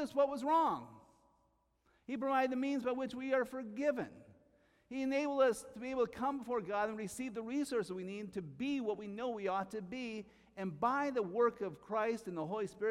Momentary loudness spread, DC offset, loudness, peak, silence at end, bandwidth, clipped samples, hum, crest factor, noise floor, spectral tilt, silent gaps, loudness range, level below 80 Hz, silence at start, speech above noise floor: 12 LU; under 0.1%; -37 LUFS; -20 dBFS; 0 s; 15 kHz; under 0.1%; none; 18 dB; -76 dBFS; -5.5 dB/octave; none; 3 LU; -74 dBFS; 0 s; 40 dB